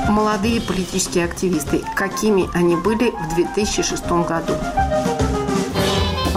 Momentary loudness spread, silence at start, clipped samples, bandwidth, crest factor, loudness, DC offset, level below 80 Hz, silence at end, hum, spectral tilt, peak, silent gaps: 4 LU; 0 s; under 0.1%; 16 kHz; 10 dB; -19 LUFS; under 0.1%; -32 dBFS; 0 s; none; -4.5 dB/octave; -8 dBFS; none